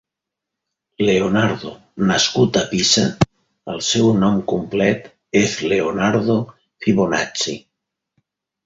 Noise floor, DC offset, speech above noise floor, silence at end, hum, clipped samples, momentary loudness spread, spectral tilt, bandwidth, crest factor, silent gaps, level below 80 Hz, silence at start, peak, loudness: -83 dBFS; under 0.1%; 66 dB; 1.1 s; none; under 0.1%; 9 LU; -4.5 dB/octave; 8 kHz; 18 dB; none; -48 dBFS; 1 s; -2 dBFS; -18 LUFS